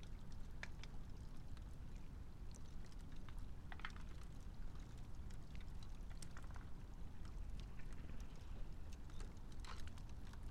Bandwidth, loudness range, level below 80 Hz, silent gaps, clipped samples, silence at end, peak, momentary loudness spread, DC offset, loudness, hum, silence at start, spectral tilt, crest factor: 12 kHz; 1 LU; -52 dBFS; none; under 0.1%; 0 s; -30 dBFS; 3 LU; under 0.1%; -56 LUFS; none; 0 s; -5.5 dB/octave; 18 dB